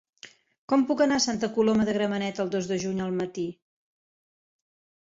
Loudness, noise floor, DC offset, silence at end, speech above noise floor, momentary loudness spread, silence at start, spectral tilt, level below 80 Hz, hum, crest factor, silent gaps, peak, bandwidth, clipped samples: -26 LUFS; -52 dBFS; under 0.1%; 1.5 s; 27 dB; 7 LU; 0.25 s; -4.5 dB/octave; -62 dBFS; none; 18 dB; 0.58-0.68 s; -10 dBFS; 7.8 kHz; under 0.1%